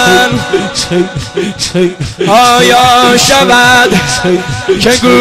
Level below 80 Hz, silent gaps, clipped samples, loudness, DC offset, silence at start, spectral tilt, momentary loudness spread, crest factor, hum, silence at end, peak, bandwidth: -34 dBFS; none; 0.2%; -7 LUFS; under 0.1%; 0 s; -3.5 dB/octave; 9 LU; 8 dB; none; 0 s; 0 dBFS; 16 kHz